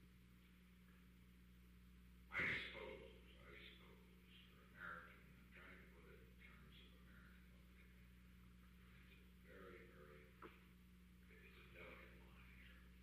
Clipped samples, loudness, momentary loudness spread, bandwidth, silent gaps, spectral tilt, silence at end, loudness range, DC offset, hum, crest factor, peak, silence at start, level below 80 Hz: under 0.1%; -56 LUFS; 15 LU; 15 kHz; none; -5 dB/octave; 0 s; 14 LU; under 0.1%; 60 Hz at -70 dBFS; 26 dB; -34 dBFS; 0 s; -70 dBFS